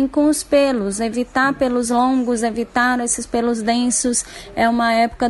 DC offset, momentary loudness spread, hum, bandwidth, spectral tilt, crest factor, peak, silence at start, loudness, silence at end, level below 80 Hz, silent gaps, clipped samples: under 0.1%; 5 LU; none; 11.5 kHz; -3 dB/octave; 14 dB; -4 dBFS; 0 s; -18 LUFS; 0 s; -44 dBFS; none; under 0.1%